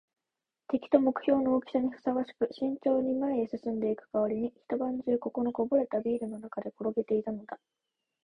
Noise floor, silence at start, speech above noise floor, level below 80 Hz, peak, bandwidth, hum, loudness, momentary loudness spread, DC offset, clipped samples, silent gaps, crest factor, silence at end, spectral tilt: -89 dBFS; 0.7 s; 59 dB; -68 dBFS; -10 dBFS; 10 kHz; none; -31 LUFS; 8 LU; under 0.1%; under 0.1%; none; 22 dB; 0.7 s; -8.5 dB/octave